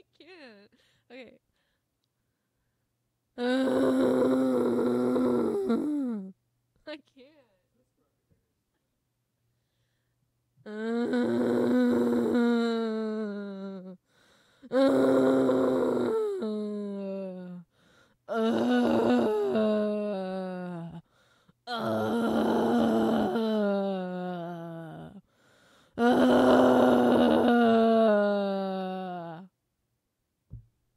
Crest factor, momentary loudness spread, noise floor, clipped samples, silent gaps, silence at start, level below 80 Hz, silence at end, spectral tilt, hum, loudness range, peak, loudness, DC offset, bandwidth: 18 dB; 18 LU; -80 dBFS; under 0.1%; none; 0.3 s; -66 dBFS; 0.35 s; -7 dB/octave; none; 9 LU; -10 dBFS; -26 LUFS; under 0.1%; 14.5 kHz